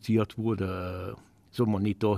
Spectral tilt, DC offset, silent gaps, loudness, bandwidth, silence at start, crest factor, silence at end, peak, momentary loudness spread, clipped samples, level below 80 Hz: -8.5 dB/octave; under 0.1%; none; -30 LUFS; 15 kHz; 0.05 s; 16 dB; 0 s; -14 dBFS; 14 LU; under 0.1%; -58 dBFS